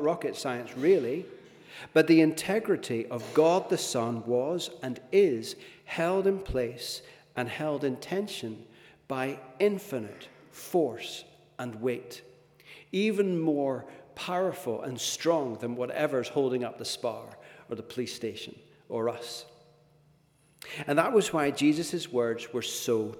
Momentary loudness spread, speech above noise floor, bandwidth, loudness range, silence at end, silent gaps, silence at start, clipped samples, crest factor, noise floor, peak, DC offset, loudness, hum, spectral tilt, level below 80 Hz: 16 LU; 35 dB; 18 kHz; 8 LU; 0 s; none; 0 s; under 0.1%; 22 dB; -64 dBFS; -8 dBFS; under 0.1%; -29 LUFS; none; -5 dB/octave; -60 dBFS